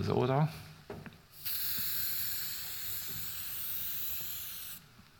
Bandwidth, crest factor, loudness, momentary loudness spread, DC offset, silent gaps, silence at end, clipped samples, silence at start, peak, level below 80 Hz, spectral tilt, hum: 19 kHz; 22 dB; -34 LUFS; 17 LU; under 0.1%; none; 0.05 s; under 0.1%; 0 s; -16 dBFS; -64 dBFS; -4 dB/octave; none